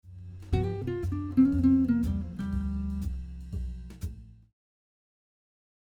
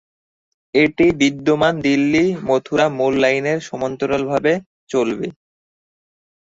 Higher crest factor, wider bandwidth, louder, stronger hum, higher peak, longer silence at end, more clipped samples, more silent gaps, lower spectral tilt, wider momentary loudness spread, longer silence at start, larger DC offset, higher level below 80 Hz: about the same, 18 dB vs 16 dB; first, 9.8 kHz vs 7.8 kHz; second, -29 LUFS vs -18 LUFS; neither; second, -12 dBFS vs -2 dBFS; first, 1.55 s vs 1.15 s; neither; second, none vs 4.66-4.87 s; first, -9 dB/octave vs -5.5 dB/octave; first, 18 LU vs 8 LU; second, 0.05 s vs 0.75 s; neither; first, -40 dBFS vs -52 dBFS